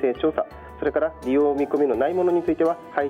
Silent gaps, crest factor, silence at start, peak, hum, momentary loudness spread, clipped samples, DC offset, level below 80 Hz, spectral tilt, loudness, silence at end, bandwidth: none; 14 dB; 0 s; -8 dBFS; none; 6 LU; under 0.1%; under 0.1%; -50 dBFS; -7.5 dB/octave; -23 LUFS; 0 s; 10.5 kHz